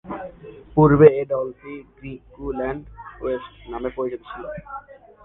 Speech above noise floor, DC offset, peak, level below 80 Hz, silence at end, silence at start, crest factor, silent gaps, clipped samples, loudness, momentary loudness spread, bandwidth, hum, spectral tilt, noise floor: 20 dB; under 0.1%; 0 dBFS; -44 dBFS; 0.45 s; 0.05 s; 22 dB; none; under 0.1%; -20 LUFS; 24 LU; 3.9 kHz; none; -11.5 dB/octave; -41 dBFS